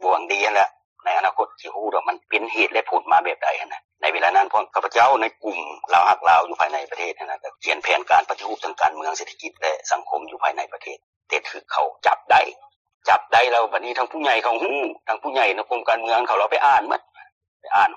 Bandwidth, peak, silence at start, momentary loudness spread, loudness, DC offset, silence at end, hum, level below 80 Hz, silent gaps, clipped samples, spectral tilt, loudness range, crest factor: 8.2 kHz; -4 dBFS; 0 s; 12 LU; -21 LUFS; under 0.1%; 0 s; none; -68 dBFS; 0.85-0.96 s, 3.84-3.89 s, 11.03-11.21 s, 12.76-12.85 s, 12.94-13.01 s, 17.32-17.41 s, 17.48-17.60 s; under 0.1%; -1.5 dB/octave; 4 LU; 18 dB